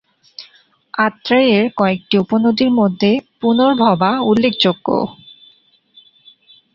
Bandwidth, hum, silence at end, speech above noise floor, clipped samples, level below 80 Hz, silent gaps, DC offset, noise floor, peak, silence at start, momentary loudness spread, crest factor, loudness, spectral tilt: 7.2 kHz; none; 1.65 s; 38 dB; under 0.1%; -56 dBFS; none; under 0.1%; -53 dBFS; -2 dBFS; 0.4 s; 9 LU; 14 dB; -15 LUFS; -7 dB/octave